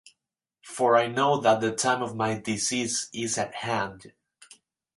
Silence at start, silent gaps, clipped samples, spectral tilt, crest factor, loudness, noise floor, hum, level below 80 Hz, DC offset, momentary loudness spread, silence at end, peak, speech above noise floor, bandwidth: 0.65 s; none; under 0.1%; -3.5 dB/octave; 20 dB; -26 LUFS; -85 dBFS; none; -66 dBFS; under 0.1%; 7 LU; 0.9 s; -6 dBFS; 60 dB; 11.5 kHz